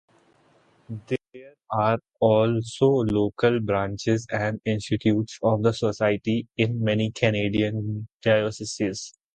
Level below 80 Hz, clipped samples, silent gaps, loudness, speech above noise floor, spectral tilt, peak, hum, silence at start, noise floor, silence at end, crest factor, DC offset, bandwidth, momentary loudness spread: -54 dBFS; under 0.1%; 8.14-8.20 s; -24 LUFS; 37 dB; -6.5 dB/octave; -6 dBFS; none; 0.9 s; -61 dBFS; 0.25 s; 20 dB; under 0.1%; 9.2 kHz; 9 LU